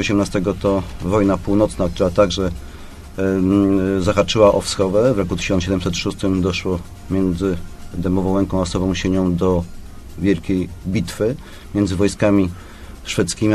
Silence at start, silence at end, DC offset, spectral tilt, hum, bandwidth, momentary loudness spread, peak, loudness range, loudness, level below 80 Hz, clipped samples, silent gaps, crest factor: 0 s; 0 s; under 0.1%; -6 dB/octave; none; 14 kHz; 10 LU; 0 dBFS; 4 LU; -19 LUFS; -34 dBFS; under 0.1%; none; 18 dB